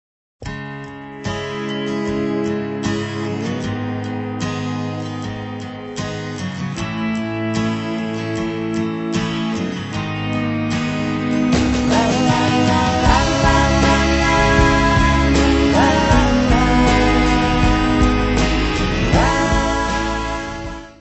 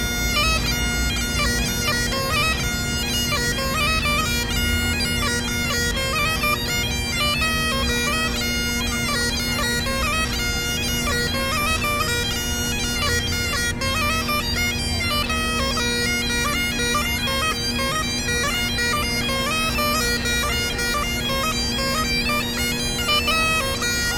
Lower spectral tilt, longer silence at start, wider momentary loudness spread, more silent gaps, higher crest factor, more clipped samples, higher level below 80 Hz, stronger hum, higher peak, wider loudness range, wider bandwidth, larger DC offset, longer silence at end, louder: first, -5.5 dB/octave vs -2.5 dB/octave; first, 0.4 s vs 0 s; first, 12 LU vs 3 LU; neither; about the same, 16 dB vs 14 dB; neither; about the same, -26 dBFS vs -30 dBFS; neither; first, 0 dBFS vs -8 dBFS; first, 10 LU vs 1 LU; second, 8.4 kHz vs 19 kHz; neither; about the same, 0.1 s vs 0 s; first, -18 LUFS vs -21 LUFS